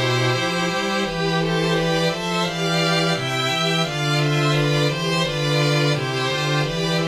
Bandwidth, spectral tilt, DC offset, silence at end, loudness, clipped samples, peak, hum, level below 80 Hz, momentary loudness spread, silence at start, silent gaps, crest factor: 15 kHz; -4.5 dB/octave; under 0.1%; 0 s; -20 LUFS; under 0.1%; -8 dBFS; none; -46 dBFS; 3 LU; 0 s; none; 12 dB